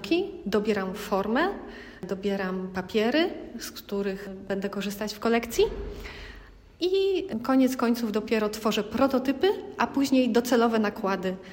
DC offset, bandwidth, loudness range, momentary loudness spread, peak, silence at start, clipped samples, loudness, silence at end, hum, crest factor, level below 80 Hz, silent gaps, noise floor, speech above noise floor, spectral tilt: under 0.1%; 16.5 kHz; 5 LU; 14 LU; -10 dBFS; 0 s; under 0.1%; -27 LUFS; 0 s; none; 18 dB; -50 dBFS; none; -48 dBFS; 22 dB; -5 dB/octave